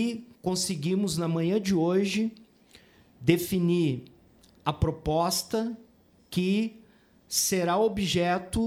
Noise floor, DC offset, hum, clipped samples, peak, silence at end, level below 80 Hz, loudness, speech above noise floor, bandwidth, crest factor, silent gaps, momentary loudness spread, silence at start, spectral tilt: -59 dBFS; under 0.1%; none; under 0.1%; -8 dBFS; 0 s; -48 dBFS; -27 LUFS; 32 dB; 19 kHz; 20 dB; none; 9 LU; 0 s; -5 dB/octave